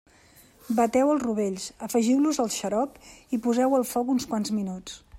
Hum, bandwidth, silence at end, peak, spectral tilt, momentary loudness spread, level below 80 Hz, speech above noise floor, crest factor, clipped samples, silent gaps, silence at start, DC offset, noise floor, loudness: none; 16 kHz; 0 s; -10 dBFS; -5 dB/octave; 10 LU; -60 dBFS; 30 dB; 16 dB; under 0.1%; none; 0.7 s; under 0.1%; -56 dBFS; -26 LUFS